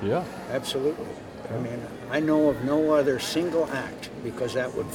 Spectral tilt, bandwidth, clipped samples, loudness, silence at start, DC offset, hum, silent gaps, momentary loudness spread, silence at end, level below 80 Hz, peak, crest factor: -5.5 dB/octave; 18 kHz; under 0.1%; -27 LUFS; 0 s; under 0.1%; none; none; 13 LU; 0 s; -56 dBFS; -10 dBFS; 16 dB